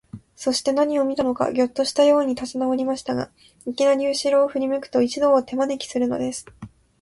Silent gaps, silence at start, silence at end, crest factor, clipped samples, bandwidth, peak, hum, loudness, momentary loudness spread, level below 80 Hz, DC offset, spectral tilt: none; 0.15 s; 0.35 s; 16 dB; under 0.1%; 11.5 kHz; -6 dBFS; none; -21 LUFS; 10 LU; -58 dBFS; under 0.1%; -4 dB/octave